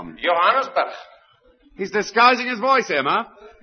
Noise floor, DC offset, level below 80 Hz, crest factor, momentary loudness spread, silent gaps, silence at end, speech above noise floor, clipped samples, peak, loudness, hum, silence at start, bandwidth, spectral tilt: -55 dBFS; under 0.1%; -60 dBFS; 20 dB; 14 LU; none; 0.15 s; 36 dB; under 0.1%; -2 dBFS; -19 LUFS; none; 0 s; 6.6 kHz; -3 dB/octave